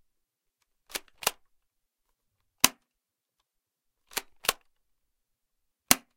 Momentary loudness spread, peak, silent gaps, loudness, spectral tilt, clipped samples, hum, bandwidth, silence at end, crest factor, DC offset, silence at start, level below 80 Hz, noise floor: 14 LU; 0 dBFS; none; -29 LUFS; 0 dB/octave; under 0.1%; none; 16.5 kHz; 0.2 s; 36 dB; under 0.1%; 0.95 s; -64 dBFS; -85 dBFS